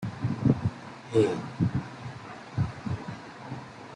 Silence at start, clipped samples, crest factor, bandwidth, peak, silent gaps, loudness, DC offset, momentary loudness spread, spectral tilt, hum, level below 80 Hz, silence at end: 0 s; under 0.1%; 22 dB; 10.5 kHz; -10 dBFS; none; -30 LUFS; under 0.1%; 15 LU; -8 dB/octave; none; -54 dBFS; 0 s